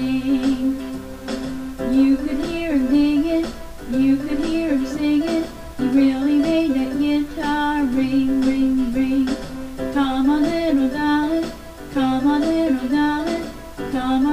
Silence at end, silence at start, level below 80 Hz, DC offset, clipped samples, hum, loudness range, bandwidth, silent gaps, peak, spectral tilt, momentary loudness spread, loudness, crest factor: 0 s; 0 s; -38 dBFS; under 0.1%; under 0.1%; none; 1 LU; 15 kHz; none; -6 dBFS; -5.5 dB/octave; 11 LU; -20 LUFS; 12 dB